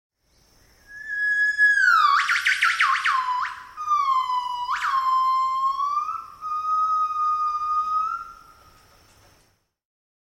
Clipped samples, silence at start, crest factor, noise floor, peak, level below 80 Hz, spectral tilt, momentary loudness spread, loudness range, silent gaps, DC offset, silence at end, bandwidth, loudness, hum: under 0.1%; 0.9 s; 16 dB; -64 dBFS; -8 dBFS; -64 dBFS; 2 dB/octave; 14 LU; 6 LU; none; under 0.1%; 1.95 s; 15.5 kHz; -21 LUFS; none